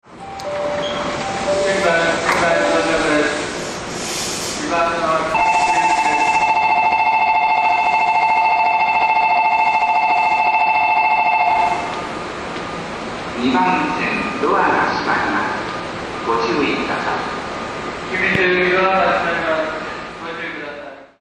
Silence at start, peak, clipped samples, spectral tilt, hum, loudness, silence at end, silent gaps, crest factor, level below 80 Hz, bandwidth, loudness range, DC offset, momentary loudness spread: 0.1 s; -2 dBFS; under 0.1%; -3.5 dB/octave; none; -17 LUFS; 0.15 s; none; 16 dB; -46 dBFS; 12 kHz; 4 LU; under 0.1%; 11 LU